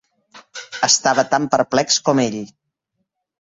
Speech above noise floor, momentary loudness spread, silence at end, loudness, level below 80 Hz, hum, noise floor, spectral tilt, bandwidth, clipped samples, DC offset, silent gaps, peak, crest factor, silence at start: 58 dB; 20 LU; 0.95 s; -17 LUFS; -62 dBFS; none; -75 dBFS; -2.5 dB/octave; 8.2 kHz; under 0.1%; under 0.1%; none; -2 dBFS; 18 dB; 0.35 s